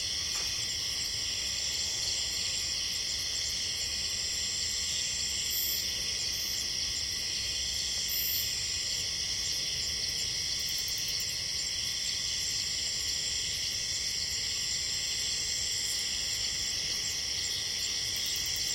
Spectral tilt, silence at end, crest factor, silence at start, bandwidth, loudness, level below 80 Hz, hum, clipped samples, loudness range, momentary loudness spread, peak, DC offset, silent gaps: 0.5 dB/octave; 0 s; 16 dB; 0 s; 16.5 kHz; -30 LUFS; -54 dBFS; none; under 0.1%; 0 LU; 1 LU; -16 dBFS; under 0.1%; none